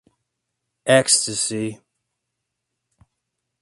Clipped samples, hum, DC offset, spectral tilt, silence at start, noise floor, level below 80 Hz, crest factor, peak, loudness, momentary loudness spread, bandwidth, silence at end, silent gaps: under 0.1%; none; under 0.1%; -2.5 dB/octave; 0.85 s; -80 dBFS; -66 dBFS; 24 dB; 0 dBFS; -19 LUFS; 15 LU; 11.5 kHz; 1.85 s; none